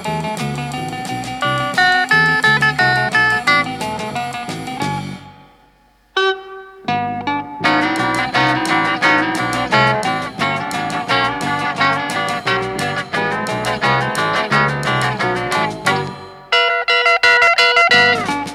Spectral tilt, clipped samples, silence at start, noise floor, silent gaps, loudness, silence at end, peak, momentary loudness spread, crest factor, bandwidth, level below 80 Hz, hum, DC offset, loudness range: -4 dB/octave; under 0.1%; 0 s; -53 dBFS; none; -15 LUFS; 0 s; 0 dBFS; 12 LU; 16 dB; 16 kHz; -50 dBFS; none; under 0.1%; 6 LU